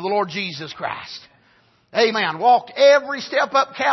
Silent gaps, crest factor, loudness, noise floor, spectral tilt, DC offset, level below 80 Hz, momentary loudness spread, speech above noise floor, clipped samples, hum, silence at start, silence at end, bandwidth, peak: none; 16 dB; -19 LUFS; -58 dBFS; -3.5 dB/octave; under 0.1%; -70 dBFS; 14 LU; 39 dB; under 0.1%; none; 0 s; 0 s; 6.2 kHz; -4 dBFS